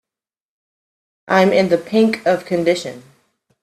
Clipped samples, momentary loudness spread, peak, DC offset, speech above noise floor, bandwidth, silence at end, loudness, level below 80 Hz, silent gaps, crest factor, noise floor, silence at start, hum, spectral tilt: under 0.1%; 6 LU; 0 dBFS; under 0.1%; 73 dB; 14 kHz; 0.6 s; -16 LUFS; -62 dBFS; none; 18 dB; -89 dBFS; 1.3 s; none; -6 dB/octave